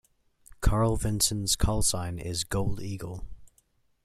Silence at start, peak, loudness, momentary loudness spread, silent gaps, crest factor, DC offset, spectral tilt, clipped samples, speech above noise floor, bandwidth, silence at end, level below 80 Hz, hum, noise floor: 0.6 s; -10 dBFS; -28 LUFS; 12 LU; none; 20 dB; under 0.1%; -4 dB/octave; under 0.1%; 41 dB; 14.5 kHz; 0.6 s; -36 dBFS; none; -68 dBFS